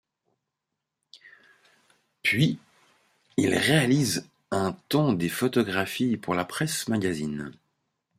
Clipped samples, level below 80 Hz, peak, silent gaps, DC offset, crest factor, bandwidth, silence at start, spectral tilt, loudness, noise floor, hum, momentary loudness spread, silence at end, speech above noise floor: under 0.1%; -64 dBFS; -6 dBFS; none; under 0.1%; 22 dB; 16 kHz; 1.25 s; -5 dB/octave; -26 LUFS; -84 dBFS; none; 10 LU; 0.7 s; 59 dB